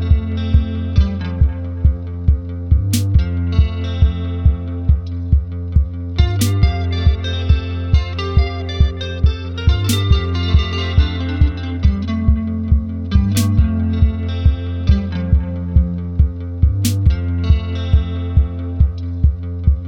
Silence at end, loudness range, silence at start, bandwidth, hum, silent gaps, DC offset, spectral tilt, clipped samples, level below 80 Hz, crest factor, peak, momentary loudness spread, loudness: 0 s; 1 LU; 0 s; 16.5 kHz; none; none; under 0.1%; -6.5 dB/octave; under 0.1%; -20 dBFS; 14 dB; -2 dBFS; 3 LU; -18 LUFS